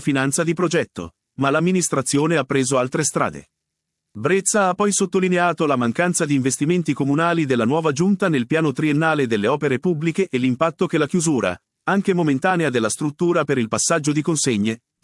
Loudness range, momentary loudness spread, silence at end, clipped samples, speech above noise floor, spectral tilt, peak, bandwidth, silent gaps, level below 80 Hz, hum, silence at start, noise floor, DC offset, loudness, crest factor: 1 LU; 4 LU; 0.25 s; under 0.1%; 60 dB; -5 dB/octave; -4 dBFS; 12 kHz; none; -62 dBFS; none; 0 s; -79 dBFS; under 0.1%; -20 LUFS; 16 dB